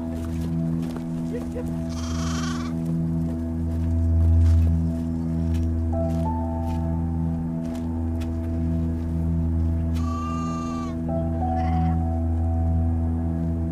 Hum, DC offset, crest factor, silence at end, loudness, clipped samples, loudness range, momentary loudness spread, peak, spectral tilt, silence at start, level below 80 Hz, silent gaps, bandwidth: none; under 0.1%; 12 dB; 0 s; -25 LUFS; under 0.1%; 4 LU; 6 LU; -10 dBFS; -8 dB/octave; 0 s; -30 dBFS; none; 8.6 kHz